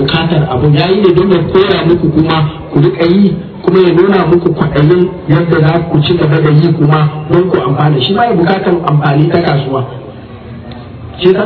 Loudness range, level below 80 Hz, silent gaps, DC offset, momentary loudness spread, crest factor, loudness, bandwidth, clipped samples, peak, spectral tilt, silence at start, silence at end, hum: 2 LU; -34 dBFS; none; under 0.1%; 9 LU; 10 dB; -9 LUFS; 5.2 kHz; 1%; 0 dBFS; -10 dB/octave; 0 s; 0 s; none